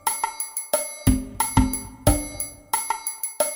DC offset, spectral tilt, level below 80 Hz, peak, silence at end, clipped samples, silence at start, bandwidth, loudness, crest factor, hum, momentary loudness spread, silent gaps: under 0.1%; -4.5 dB/octave; -32 dBFS; -2 dBFS; 0 s; under 0.1%; 0.05 s; 17 kHz; -24 LUFS; 22 dB; none; 6 LU; none